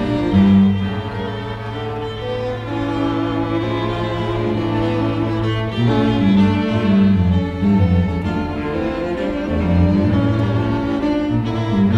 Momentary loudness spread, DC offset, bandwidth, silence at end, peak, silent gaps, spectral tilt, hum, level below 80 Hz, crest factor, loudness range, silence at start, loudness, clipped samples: 10 LU; under 0.1%; 7.6 kHz; 0 s; -2 dBFS; none; -8.5 dB/octave; none; -34 dBFS; 14 dB; 5 LU; 0 s; -18 LUFS; under 0.1%